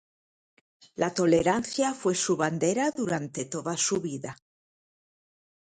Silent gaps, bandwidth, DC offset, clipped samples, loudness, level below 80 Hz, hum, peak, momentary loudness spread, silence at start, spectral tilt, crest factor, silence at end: none; 9.6 kHz; under 0.1%; under 0.1%; -27 LUFS; -64 dBFS; none; -10 dBFS; 11 LU; 1 s; -4 dB/octave; 20 dB; 1.35 s